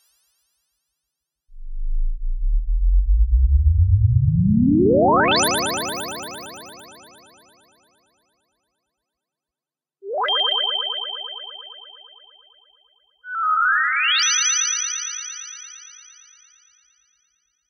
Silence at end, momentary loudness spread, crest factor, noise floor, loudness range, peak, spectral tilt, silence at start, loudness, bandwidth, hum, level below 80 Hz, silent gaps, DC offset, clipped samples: 1.8 s; 21 LU; 16 dB; under -90 dBFS; 10 LU; -6 dBFS; -3.5 dB/octave; 1.5 s; -19 LUFS; 17 kHz; none; -26 dBFS; none; under 0.1%; under 0.1%